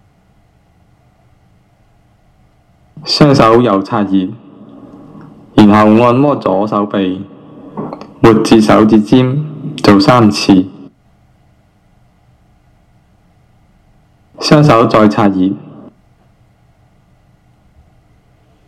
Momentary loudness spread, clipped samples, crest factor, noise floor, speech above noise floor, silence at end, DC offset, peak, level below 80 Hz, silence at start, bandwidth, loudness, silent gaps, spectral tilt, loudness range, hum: 18 LU; 0.7%; 12 dB; -50 dBFS; 42 dB; 3 s; under 0.1%; 0 dBFS; -42 dBFS; 2.95 s; 13 kHz; -9 LUFS; none; -6.5 dB/octave; 7 LU; none